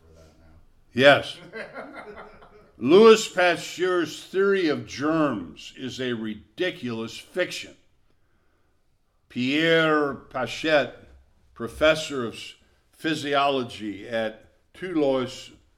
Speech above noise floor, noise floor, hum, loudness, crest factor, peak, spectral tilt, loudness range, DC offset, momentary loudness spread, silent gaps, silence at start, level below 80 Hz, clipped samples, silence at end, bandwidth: 42 dB; -65 dBFS; none; -23 LUFS; 22 dB; -2 dBFS; -4.5 dB/octave; 10 LU; under 0.1%; 20 LU; none; 0.95 s; -56 dBFS; under 0.1%; 0.3 s; 14.5 kHz